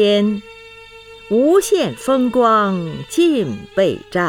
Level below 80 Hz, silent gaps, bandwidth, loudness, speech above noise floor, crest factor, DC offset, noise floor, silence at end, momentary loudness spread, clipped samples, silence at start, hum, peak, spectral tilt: -52 dBFS; none; 18.5 kHz; -16 LUFS; 24 dB; 14 dB; under 0.1%; -39 dBFS; 0 s; 8 LU; under 0.1%; 0 s; 50 Hz at -50 dBFS; -4 dBFS; -5 dB/octave